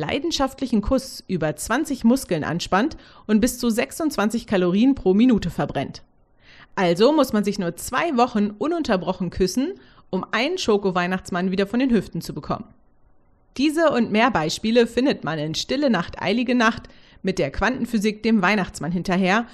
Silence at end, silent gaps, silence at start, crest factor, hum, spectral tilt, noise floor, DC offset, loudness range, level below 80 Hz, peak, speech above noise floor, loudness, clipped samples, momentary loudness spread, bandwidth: 0 s; none; 0 s; 16 dB; none; -5 dB/octave; -55 dBFS; under 0.1%; 3 LU; -44 dBFS; -4 dBFS; 34 dB; -22 LUFS; under 0.1%; 9 LU; 13.5 kHz